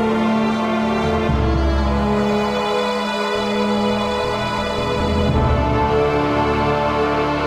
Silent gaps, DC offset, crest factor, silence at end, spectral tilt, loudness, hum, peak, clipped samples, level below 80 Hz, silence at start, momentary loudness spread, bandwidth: none; under 0.1%; 14 dB; 0 s; -6.5 dB/octave; -19 LUFS; none; -4 dBFS; under 0.1%; -28 dBFS; 0 s; 3 LU; 13 kHz